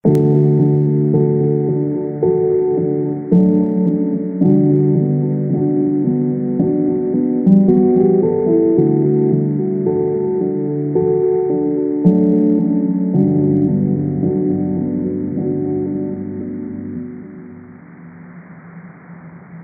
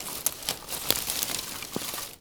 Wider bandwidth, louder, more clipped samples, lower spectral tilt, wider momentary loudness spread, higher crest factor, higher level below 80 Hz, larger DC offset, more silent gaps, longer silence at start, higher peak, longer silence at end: second, 2.4 kHz vs over 20 kHz; first, -16 LUFS vs -29 LUFS; neither; first, -13 dB/octave vs -1 dB/octave; about the same, 8 LU vs 7 LU; second, 14 dB vs 30 dB; about the same, -52 dBFS vs -56 dBFS; neither; neither; about the same, 0.05 s vs 0 s; about the same, 0 dBFS vs -2 dBFS; about the same, 0 s vs 0 s